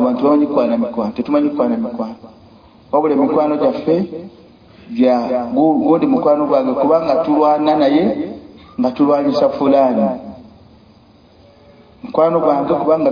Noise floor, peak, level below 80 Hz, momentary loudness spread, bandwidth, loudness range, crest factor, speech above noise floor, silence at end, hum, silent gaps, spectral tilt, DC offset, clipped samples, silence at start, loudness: -47 dBFS; -2 dBFS; -54 dBFS; 12 LU; 5.2 kHz; 4 LU; 14 dB; 32 dB; 0 s; none; none; -8.5 dB/octave; under 0.1%; under 0.1%; 0 s; -15 LUFS